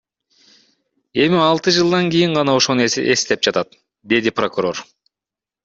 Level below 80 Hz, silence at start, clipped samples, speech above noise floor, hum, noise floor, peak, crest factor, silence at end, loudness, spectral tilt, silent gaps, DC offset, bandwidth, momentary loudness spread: -58 dBFS; 1.15 s; under 0.1%; 72 dB; none; -88 dBFS; 0 dBFS; 18 dB; 0.8 s; -16 LUFS; -4 dB/octave; none; under 0.1%; 8 kHz; 9 LU